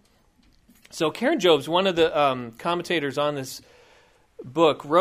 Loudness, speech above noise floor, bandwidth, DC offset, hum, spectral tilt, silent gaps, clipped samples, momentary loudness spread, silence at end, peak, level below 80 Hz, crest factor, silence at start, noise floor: -23 LUFS; 38 dB; 15.5 kHz; under 0.1%; none; -4.5 dB/octave; none; under 0.1%; 13 LU; 0 s; -4 dBFS; -60 dBFS; 20 dB; 0.95 s; -60 dBFS